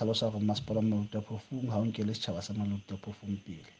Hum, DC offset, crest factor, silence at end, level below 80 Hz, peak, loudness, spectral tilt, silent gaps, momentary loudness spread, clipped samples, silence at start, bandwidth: none; under 0.1%; 16 dB; 0.1 s; -62 dBFS; -18 dBFS; -34 LUFS; -6.5 dB/octave; none; 9 LU; under 0.1%; 0 s; 9 kHz